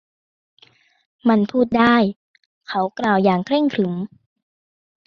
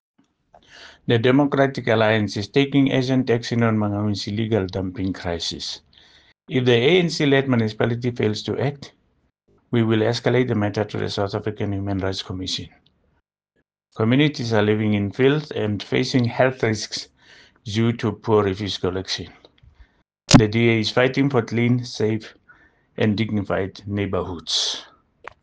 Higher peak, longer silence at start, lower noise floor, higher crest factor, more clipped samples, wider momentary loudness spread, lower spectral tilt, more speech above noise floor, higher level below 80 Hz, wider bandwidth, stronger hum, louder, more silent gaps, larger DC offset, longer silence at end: about the same, -2 dBFS vs 0 dBFS; first, 1.25 s vs 0.75 s; first, under -90 dBFS vs -72 dBFS; about the same, 18 dB vs 22 dB; neither; about the same, 10 LU vs 9 LU; first, -7.5 dB/octave vs -5.5 dB/octave; first, over 72 dB vs 51 dB; second, -58 dBFS vs -48 dBFS; second, 6.8 kHz vs 9.6 kHz; neither; about the same, -19 LUFS vs -21 LUFS; first, 2.16-2.34 s, 2.46-2.61 s vs none; neither; first, 1 s vs 0.6 s